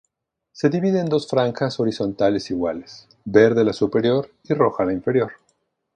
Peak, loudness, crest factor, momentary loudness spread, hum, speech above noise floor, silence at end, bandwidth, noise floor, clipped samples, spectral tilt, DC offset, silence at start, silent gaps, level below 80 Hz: 0 dBFS; -20 LUFS; 20 dB; 9 LU; none; 56 dB; 0.6 s; 9.4 kHz; -76 dBFS; under 0.1%; -7 dB/octave; under 0.1%; 0.55 s; none; -56 dBFS